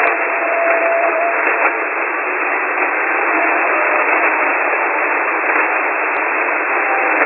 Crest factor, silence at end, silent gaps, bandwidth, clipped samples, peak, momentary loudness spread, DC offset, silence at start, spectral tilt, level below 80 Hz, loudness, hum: 16 dB; 0 s; none; 4.1 kHz; under 0.1%; 0 dBFS; 3 LU; under 0.1%; 0 s; -7.5 dB/octave; -78 dBFS; -15 LUFS; none